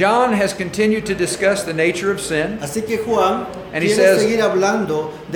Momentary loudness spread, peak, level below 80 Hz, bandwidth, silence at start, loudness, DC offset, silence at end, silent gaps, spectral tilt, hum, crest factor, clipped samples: 8 LU; -2 dBFS; -48 dBFS; 19 kHz; 0 s; -18 LUFS; under 0.1%; 0 s; none; -4.5 dB/octave; none; 16 dB; under 0.1%